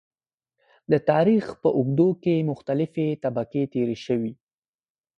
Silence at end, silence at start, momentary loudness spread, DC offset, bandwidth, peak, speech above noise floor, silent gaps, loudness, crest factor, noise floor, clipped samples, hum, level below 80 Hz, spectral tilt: 0.85 s; 0.9 s; 7 LU; under 0.1%; 8 kHz; -6 dBFS; 58 dB; none; -24 LUFS; 18 dB; -80 dBFS; under 0.1%; none; -62 dBFS; -9 dB/octave